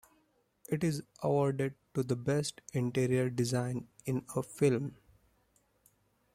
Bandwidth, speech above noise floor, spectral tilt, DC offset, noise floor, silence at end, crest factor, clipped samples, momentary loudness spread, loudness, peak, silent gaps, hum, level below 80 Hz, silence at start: 15.5 kHz; 40 dB; -6.5 dB/octave; under 0.1%; -73 dBFS; 1.4 s; 18 dB; under 0.1%; 8 LU; -34 LUFS; -16 dBFS; none; none; -68 dBFS; 0.7 s